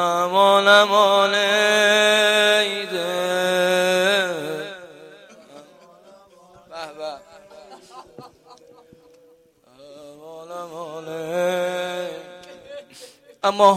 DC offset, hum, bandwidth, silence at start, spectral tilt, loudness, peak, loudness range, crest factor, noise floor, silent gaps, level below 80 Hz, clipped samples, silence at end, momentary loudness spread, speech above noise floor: under 0.1%; none; 15.5 kHz; 0 s; -2.5 dB/octave; -18 LUFS; -2 dBFS; 23 LU; 20 dB; -55 dBFS; none; -70 dBFS; under 0.1%; 0 s; 24 LU; 39 dB